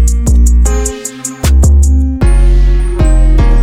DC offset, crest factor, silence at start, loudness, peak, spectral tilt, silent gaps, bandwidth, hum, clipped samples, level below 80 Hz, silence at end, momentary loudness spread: under 0.1%; 6 dB; 0 s; -11 LUFS; 0 dBFS; -6 dB/octave; none; 15 kHz; none; under 0.1%; -8 dBFS; 0 s; 8 LU